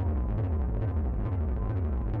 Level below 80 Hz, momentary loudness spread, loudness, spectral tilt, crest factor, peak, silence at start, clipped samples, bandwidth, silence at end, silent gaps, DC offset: -30 dBFS; 1 LU; -31 LUFS; -12 dB/octave; 6 dB; -22 dBFS; 0 s; under 0.1%; 3.3 kHz; 0 s; none; under 0.1%